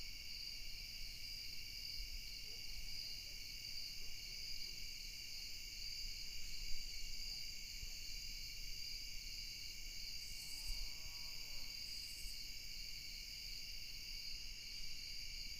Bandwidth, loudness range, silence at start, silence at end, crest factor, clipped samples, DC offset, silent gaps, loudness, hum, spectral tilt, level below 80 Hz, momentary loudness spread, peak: 15.5 kHz; 1 LU; 0 s; 0 s; 18 dB; under 0.1%; under 0.1%; none; -48 LUFS; none; 0 dB/octave; -54 dBFS; 2 LU; -28 dBFS